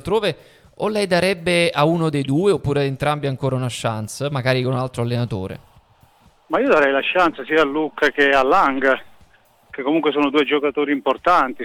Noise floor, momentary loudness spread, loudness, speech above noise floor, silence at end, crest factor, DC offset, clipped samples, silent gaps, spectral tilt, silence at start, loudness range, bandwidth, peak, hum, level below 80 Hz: -53 dBFS; 9 LU; -19 LUFS; 35 dB; 0 s; 16 dB; under 0.1%; under 0.1%; none; -5.5 dB/octave; 0.05 s; 5 LU; 16 kHz; -4 dBFS; none; -50 dBFS